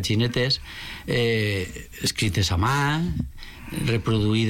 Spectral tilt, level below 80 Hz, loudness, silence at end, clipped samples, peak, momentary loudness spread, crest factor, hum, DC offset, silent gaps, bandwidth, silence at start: -5 dB/octave; -40 dBFS; -24 LUFS; 0 s; under 0.1%; -12 dBFS; 13 LU; 12 dB; none; under 0.1%; none; 17 kHz; 0 s